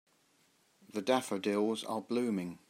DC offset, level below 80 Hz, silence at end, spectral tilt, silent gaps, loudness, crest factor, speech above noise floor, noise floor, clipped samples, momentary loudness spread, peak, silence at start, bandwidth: under 0.1%; -84 dBFS; 0.15 s; -5 dB/octave; none; -34 LUFS; 22 dB; 37 dB; -71 dBFS; under 0.1%; 6 LU; -14 dBFS; 0.95 s; 16 kHz